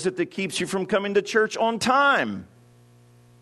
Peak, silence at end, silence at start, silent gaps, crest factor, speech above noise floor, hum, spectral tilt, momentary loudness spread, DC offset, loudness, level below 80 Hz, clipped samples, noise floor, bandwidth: -6 dBFS; 1 s; 0 s; none; 18 dB; 31 dB; 60 Hz at -50 dBFS; -4 dB/octave; 9 LU; under 0.1%; -23 LUFS; -66 dBFS; under 0.1%; -54 dBFS; 12.5 kHz